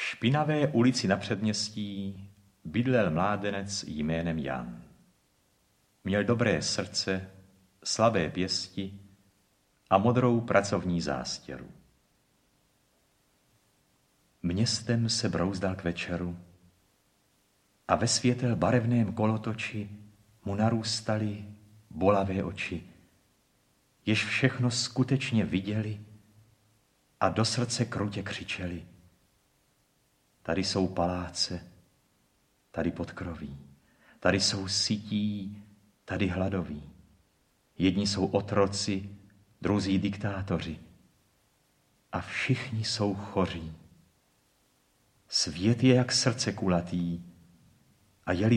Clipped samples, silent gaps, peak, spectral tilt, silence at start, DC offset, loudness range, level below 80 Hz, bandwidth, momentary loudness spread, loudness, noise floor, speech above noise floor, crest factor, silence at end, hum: under 0.1%; none; -8 dBFS; -5 dB/octave; 0 s; under 0.1%; 5 LU; -58 dBFS; 11.5 kHz; 15 LU; -29 LUFS; -70 dBFS; 41 dB; 24 dB; 0 s; none